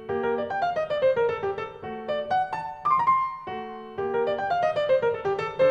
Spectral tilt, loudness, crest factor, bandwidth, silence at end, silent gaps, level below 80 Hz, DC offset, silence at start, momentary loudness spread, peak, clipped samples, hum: -6 dB/octave; -26 LUFS; 14 dB; 8 kHz; 0 s; none; -62 dBFS; under 0.1%; 0 s; 11 LU; -10 dBFS; under 0.1%; none